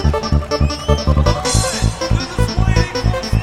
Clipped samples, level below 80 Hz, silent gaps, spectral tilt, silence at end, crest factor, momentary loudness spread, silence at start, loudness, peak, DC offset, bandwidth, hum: under 0.1%; -20 dBFS; none; -5 dB/octave; 0 s; 16 dB; 4 LU; 0 s; -17 LUFS; 0 dBFS; 1%; 14 kHz; none